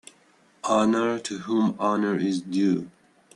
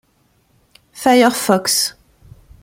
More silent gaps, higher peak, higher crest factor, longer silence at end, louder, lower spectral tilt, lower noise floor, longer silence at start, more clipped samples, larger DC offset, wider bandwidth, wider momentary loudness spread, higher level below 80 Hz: neither; second, -10 dBFS vs -2 dBFS; about the same, 16 dB vs 18 dB; second, 0.45 s vs 0.75 s; second, -25 LUFS vs -15 LUFS; first, -5.5 dB/octave vs -3 dB/octave; about the same, -60 dBFS vs -59 dBFS; second, 0.65 s vs 0.95 s; neither; neither; second, 11.5 kHz vs 16.5 kHz; about the same, 8 LU vs 7 LU; second, -68 dBFS vs -54 dBFS